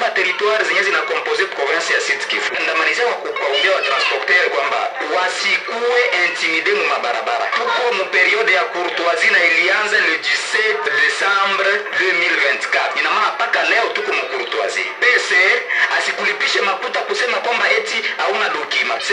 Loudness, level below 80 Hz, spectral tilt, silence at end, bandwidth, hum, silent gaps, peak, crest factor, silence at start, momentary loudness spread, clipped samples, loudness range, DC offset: -15 LUFS; -78 dBFS; -0.5 dB/octave; 0 s; 11 kHz; none; none; -2 dBFS; 16 dB; 0 s; 6 LU; under 0.1%; 2 LU; under 0.1%